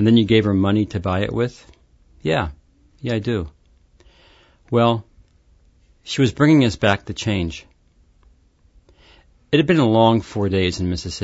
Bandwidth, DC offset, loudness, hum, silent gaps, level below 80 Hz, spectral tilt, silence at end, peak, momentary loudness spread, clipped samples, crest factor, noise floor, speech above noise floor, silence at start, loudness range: 8 kHz; under 0.1%; -19 LUFS; none; none; -44 dBFS; -6.5 dB/octave; 0.05 s; -2 dBFS; 12 LU; under 0.1%; 18 dB; -56 dBFS; 38 dB; 0 s; 5 LU